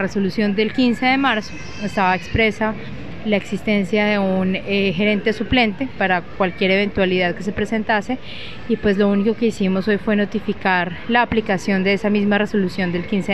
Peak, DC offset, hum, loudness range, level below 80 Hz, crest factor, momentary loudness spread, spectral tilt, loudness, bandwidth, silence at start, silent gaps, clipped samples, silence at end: -2 dBFS; 2%; none; 1 LU; -42 dBFS; 18 dB; 6 LU; -6.5 dB/octave; -19 LUFS; 11.5 kHz; 0 s; none; under 0.1%; 0 s